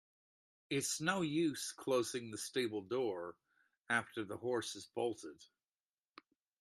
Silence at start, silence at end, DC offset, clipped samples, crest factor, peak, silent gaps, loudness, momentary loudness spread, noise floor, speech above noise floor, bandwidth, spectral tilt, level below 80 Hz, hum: 0.7 s; 1.15 s; under 0.1%; under 0.1%; 22 dB; -18 dBFS; 3.80-3.84 s; -39 LUFS; 9 LU; under -90 dBFS; over 51 dB; 13.5 kHz; -3.5 dB/octave; -82 dBFS; none